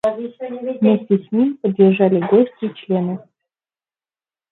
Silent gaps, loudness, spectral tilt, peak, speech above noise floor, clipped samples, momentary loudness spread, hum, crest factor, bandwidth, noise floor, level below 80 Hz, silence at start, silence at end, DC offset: none; -17 LUFS; -10 dB/octave; -2 dBFS; over 73 dB; under 0.1%; 14 LU; none; 16 dB; 4.1 kHz; under -90 dBFS; -66 dBFS; 0.05 s; 1.3 s; under 0.1%